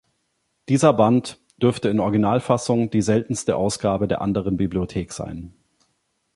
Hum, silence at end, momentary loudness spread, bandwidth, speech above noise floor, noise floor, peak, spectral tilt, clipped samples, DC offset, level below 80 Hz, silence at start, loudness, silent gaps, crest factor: none; 0.85 s; 11 LU; 11.5 kHz; 51 dB; -72 dBFS; -2 dBFS; -6.5 dB/octave; under 0.1%; under 0.1%; -46 dBFS; 0.7 s; -21 LUFS; none; 20 dB